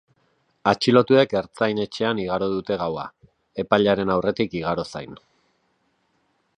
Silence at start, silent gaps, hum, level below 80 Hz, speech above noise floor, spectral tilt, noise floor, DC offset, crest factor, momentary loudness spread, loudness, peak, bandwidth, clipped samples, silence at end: 0.65 s; none; none; -56 dBFS; 47 dB; -6 dB/octave; -68 dBFS; under 0.1%; 22 dB; 15 LU; -22 LUFS; -2 dBFS; 10.5 kHz; under 0.1%; 1.4 s